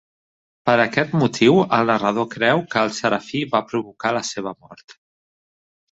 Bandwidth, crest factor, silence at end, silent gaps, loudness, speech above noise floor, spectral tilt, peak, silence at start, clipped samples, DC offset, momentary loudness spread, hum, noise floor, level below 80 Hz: 8 kHz; 20 dB; 1 s; 4.84-4.88 s; -19 LUFS; over 71 dB; -5 dB/octave; -2 dBFS; 0.65 s; under 0.1%; under 0.1%; 10 LU; none; under -90 dBFS; -60 dBFS